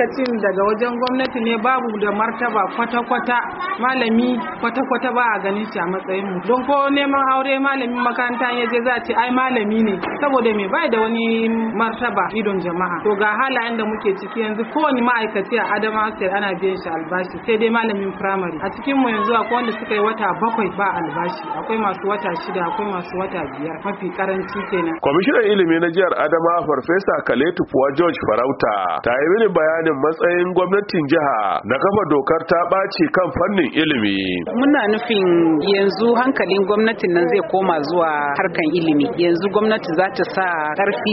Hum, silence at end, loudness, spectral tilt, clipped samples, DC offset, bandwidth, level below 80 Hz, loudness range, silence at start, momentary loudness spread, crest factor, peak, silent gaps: none; 0 s; -18 LUFS; -3.5 dB/octave; under 0.1%; under 0.1%; 5.8 kHz; -54 dBFS; 3 LU; 0 s; 6 LU; 16 dB; -2 dBFS; none